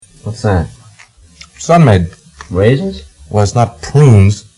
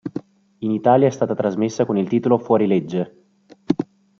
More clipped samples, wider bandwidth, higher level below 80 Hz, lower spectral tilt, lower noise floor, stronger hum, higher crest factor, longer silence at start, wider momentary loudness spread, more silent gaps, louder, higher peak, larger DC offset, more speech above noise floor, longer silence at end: first, 0.3% vs under 0.1%; first, 11.5 kHz vs 7.6 kHz; first, -34 dBFS vs -62 dBFS; about the same, -7 dB/octave vs -7.5 dB/octave; second, -42 dBFS vs -47 dBFS; neither; second, 12 dB vs 18 dB; first, 0.25 s vs 0.05 s; first, 17 LU vs 12 LU; neither; first, -11 LUFS vs -20 LUFS; about the same, 0 dBFS vs -2 dBFS; neither; about the same, 32 dB vs 29 dB; second, 0.15 s vs 0.35 s